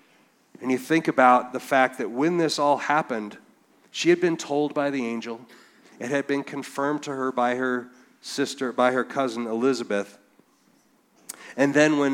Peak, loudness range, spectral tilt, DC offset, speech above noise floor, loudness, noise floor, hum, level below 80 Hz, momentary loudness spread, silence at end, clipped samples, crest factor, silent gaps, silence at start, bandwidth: -4 dBFS; 5 LU; -4.5 dB/octave; under 0.1%; 38 dB; -24 LUFS; -62 dBFS; none; -80 dBFS; 15 LU; 0 s; under 0.1%; 22 dB; none; 0.6 s; 17 kHz